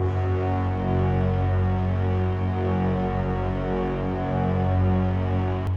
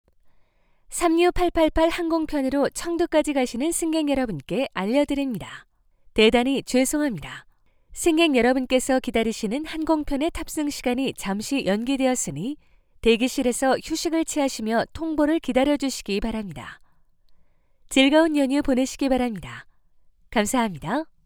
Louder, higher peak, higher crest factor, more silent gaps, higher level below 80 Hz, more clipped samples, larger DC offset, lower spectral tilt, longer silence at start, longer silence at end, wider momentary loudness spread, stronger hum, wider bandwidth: about the same, -24 LUFS vs -23 LUFS; second, -12 dBFS vs -4 dBFS; second, 10 dB vs 20 dB; neither; first, -36 dBFS vs -42 dBFS; neither; neither; first, -10 dB/octave vs -4 dB/octave; second, 0 s vs 0.9 s; second, 0 s vs 0.2 s; second, 4 LU vs 11 LU; neither; second, 5 kHz vs over 20 kHz